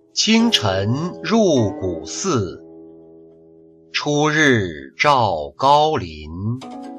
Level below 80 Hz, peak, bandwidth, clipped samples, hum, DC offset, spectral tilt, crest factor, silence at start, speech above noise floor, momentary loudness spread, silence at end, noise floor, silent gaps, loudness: -48 dBFS; -2 dBFS; 13 kHz; under 0.1%; none; under 0.1%; -4.5 dB/octave; 16 dB; 0.15 s; 29 dB; 13 LU; 0 s; -48 dBFS; none; -18 LUFS